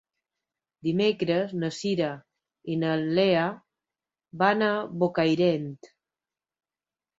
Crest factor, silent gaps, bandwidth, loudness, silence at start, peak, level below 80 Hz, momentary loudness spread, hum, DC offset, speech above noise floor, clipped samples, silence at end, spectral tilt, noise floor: 20 dB; none; 8 kHz; -26 LUFS; 0.85 s; -8 dBFS; -70 dBFS; 10 LU; none; under 0.1%; over 65 dB; under 0.1%; 1.35 s; -6.5 dB/octave; under -90 dBFS